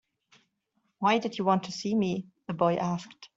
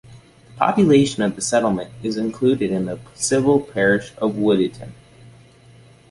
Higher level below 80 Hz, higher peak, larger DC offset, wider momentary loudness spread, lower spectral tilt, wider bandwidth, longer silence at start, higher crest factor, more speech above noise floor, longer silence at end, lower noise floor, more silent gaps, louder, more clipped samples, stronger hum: second, -70 dBFS vs -52 dBFS; second, -12 dBFS vs -2 dBFS; neither; about the same, 9 LU vs 10 LU; about the same, -6 dB/octave vs -5 dB/octave; second, 7.8 kHz vs 11.5 kHz; first, 1 s vs 0.1 s; about the same, 18 dB vs 18 dB; first, 48 dB vs 29 dB; second, 0.1 s vs 1.2 s; first, -76 dBFS vs -48 dBFS; neither; second, -29 LUFS vs -19 LUFS; neither; neither